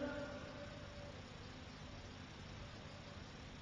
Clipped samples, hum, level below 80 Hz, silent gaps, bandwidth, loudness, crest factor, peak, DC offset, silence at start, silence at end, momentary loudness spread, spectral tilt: under 0.1%; 50 Hz at -60 dBFS; -62 dBFS; none; 9.6 kHz; -52 LUFS; 20 dB; -32 dBFS; under 0.1%; 0 s; 0 s; 5 LU; -5.5 dB/octave